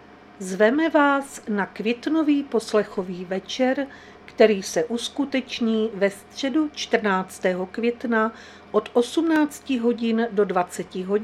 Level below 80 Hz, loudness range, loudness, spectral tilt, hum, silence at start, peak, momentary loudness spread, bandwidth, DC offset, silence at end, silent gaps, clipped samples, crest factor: -62 dBFS; 2 LU; -23 LUFS; -5 dB/octave; none; 0.1 s; -2 dBFS; 10 LU; 14.5 kHz; under 0.1%; 0 s; none; under 0.1%; 22 dB